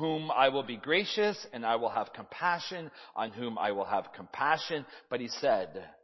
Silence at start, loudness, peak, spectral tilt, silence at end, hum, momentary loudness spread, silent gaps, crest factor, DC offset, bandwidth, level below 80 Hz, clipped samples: 0 s; -32 LUFS; -10 dBFS; -4.5 dB/octave; 0.1 s; none; 12 LU; none; 22 dB; under 0.1%; 6.2 kHz; -76 dBFS; under 0.1%